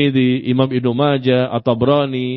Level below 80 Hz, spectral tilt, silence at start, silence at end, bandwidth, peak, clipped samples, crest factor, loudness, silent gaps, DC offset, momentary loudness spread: -52 dBFS; -10 dB/octave; 0 s; 0 s; 5.4 kHz; -2 dBFS; under 0.1%; 14 dB; -16 LUFS; none; under 0.1%; 2 LU